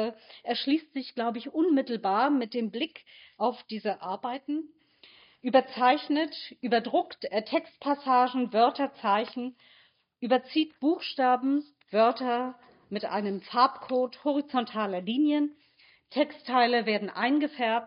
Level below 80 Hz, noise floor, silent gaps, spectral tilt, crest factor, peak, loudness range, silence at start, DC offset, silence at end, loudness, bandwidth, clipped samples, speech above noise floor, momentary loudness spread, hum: -84 dBFS; -61 dBFS; none; -2.5 dB/octave; 20 dB; -8 dBFS; 2 LU; 0 s; under 0.1%; 0 s; -28 LUFS; 5.4 kHz; under 0.1%; 34 dB; 10 LU; none